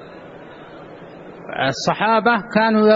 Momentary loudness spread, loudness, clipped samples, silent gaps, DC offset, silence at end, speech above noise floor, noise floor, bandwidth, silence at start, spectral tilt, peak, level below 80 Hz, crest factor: 23 LU; -18 LUFS; under 0.1%; none; under 0.1%; 0 s; 22 dB; -38 dBFS; 8 kHz; 0 s; -5 dB/octave; -4 dBFS; -58 dBFS; 16 dB